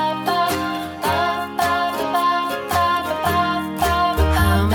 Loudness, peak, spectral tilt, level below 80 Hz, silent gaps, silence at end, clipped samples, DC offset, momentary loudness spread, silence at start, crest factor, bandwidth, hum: -20 LUFS; -4 dBFS; -5 dB/octave; -30 dBFS; none; 0 s; under 0.1%; under 0.1%; 4 LU; 0 s; 14 dB; 17.5 kHz; none